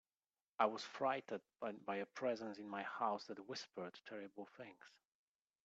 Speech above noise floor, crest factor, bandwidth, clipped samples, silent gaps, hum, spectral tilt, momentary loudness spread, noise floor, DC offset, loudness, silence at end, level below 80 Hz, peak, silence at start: over 45 dB; 24 dB; 8 kHz; under 0.1%; none; none; -2.5 dB/octave; 15 LU; under -90 dBFS; under 0.1%; -45 LUFS; 0.8 s; under -90 dBFS; -22 dBFS; 0.6 s